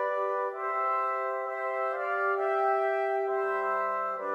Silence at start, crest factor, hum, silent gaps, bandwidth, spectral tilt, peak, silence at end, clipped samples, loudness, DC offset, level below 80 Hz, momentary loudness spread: 0 s; 12 dB; none; none; 8.4 kHz; -4.5 dB/octave; -18 dBFS; 0 s; under 0.1%; -29 LUFS; under 0.1%; under -90 dBFS; 4 LU